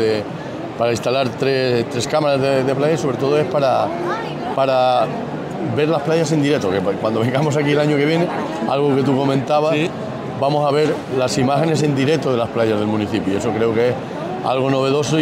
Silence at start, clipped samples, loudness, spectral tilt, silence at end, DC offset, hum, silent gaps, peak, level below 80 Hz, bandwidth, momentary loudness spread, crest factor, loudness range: 0 s; under 0.1%; -18 LUFS; -6 dB/octave; 0 s; under 0.1%; none; none; -4 dBFS; -54 dBFS; 15.5 kHz; 7 LU; 14 dB; 1 LU